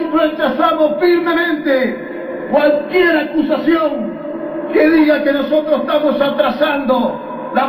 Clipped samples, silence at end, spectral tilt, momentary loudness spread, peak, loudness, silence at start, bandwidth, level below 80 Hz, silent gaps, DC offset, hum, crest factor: under 0.1%; 0 s; -7 dB/octave; 11 LU; 0 dBFS; -15 LUFS; 0 s; 15 kHz; -50 dBFS; none; under 0.1%; none; 14 dB